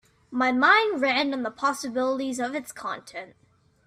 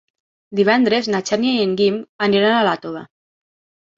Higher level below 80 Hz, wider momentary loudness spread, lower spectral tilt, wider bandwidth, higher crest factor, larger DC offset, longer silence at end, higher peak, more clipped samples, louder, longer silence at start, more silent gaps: second, -70 dBFS vs -62 dBFS; first, 16 LU vs 11 LU; second, -2.5 dB/octave vs -5 dB/octave; first, 14.5 kHz vs 7.8 kHz; about the same, 20 dB vs 18 dB; neither; second, 0.6 s vs 0.9 s; second, -6 dBFS vs -2 dBFS; neither; second, -24 LUFS vs -17 LUFS; second, 0.3 s vs 0.5 s; second, none vs 2.09-2.19 s